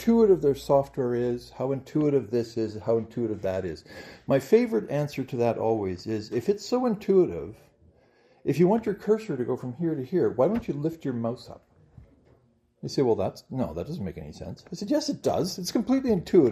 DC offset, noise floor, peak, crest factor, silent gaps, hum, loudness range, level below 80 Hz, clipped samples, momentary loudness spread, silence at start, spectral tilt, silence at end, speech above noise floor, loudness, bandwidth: under 0.1%; -63 dBFS; -8 dBFS; 18 dB; none; none; 5 LU; -58 dBFS; under 0.1%; 13 LU; 0 s; -7 dB/octave; 0 s; 38 dB; -27 LUFS; 14.5 kHz